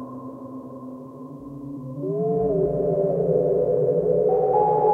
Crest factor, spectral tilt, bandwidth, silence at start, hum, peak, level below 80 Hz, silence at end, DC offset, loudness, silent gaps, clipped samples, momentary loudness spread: 14 dB; -12 dB/octave; 2.5 kHz; 0 s; none; -8 dBFS; -50 dBFS; 0 s; under 0.1%; -22 LUFS; none; under 0.1%; 18 LU